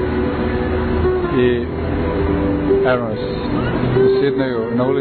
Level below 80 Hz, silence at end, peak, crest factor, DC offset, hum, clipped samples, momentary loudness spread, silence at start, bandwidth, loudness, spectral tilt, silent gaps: -28 dBFS; 0 s; -6 dBFS; 12 dB; under 0.1%; none; under 0.1%; 6 LU; 0 s; 4.5 kHz; -18 LUFS; -11 dB/octave; none